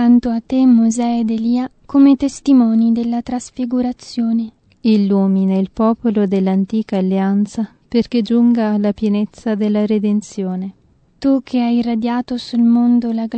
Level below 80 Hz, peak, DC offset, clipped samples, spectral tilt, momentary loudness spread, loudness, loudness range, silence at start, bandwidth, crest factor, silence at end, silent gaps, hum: -50 dBFS; -2 dBFS; under 0.1%; under 0.1%; -7 dB/octave; 9 LU; -16 LUFS; 4 LU; 0 s; 8.8 kHz; 14 dB; 0 s; none; none